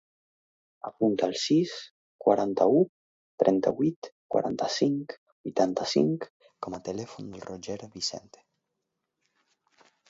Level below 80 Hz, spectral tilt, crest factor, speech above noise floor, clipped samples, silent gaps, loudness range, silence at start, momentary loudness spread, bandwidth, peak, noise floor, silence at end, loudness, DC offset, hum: -70 dBFS; -5.5 dB/octave; 22 dB; 56 dB; under 0.1%; 1.91-2.19 s, 2.89-3.38 s, 3.96-4.02 s, 4.12-4.29 s, 5.18-5.44 s, 6.30-6.40 s; 12 LU; 0.85 s; 17 LU; 7.8 kHz; -6 dBFS; -83 dBFS; 1.9 s; -28 LUFS; under 0.1%; none